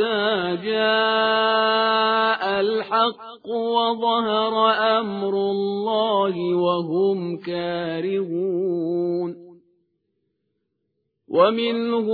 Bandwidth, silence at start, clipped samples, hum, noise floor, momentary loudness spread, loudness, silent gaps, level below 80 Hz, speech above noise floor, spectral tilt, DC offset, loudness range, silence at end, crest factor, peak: 5 kHz; 0 s; under 0.1%; none; -75 dBFS; 8 LU; -21 LUFS; none; -68 dBFS; 54 dB; -8 dB/octave; under 0.1%; 7 LU; 0 s; 18 dB; -4 dBFS